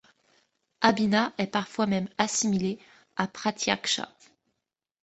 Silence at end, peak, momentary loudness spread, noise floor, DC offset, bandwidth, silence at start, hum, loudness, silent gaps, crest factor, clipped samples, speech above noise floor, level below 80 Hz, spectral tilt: 0.95 s; -4 dBFS; 8 LU; -85 dBFS; under 0.1%; 8.2 kHz; 0.8 s; none; -27 LUFS; none; 26 dB; under 0.1%; 58 dB; -66 dBFS; -3.5 dB/octave